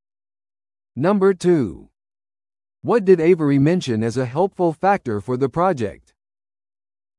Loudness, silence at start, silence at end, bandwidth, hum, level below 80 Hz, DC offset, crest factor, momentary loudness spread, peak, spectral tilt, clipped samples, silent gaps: -19 LUFS; 0.95 s; 1.25 s; 11 kHz; none; -56 dBFS; under 0.1%; 18 dB; 10 LU; -2 dBFS; -7.5 dB/octave; under 0.1%; none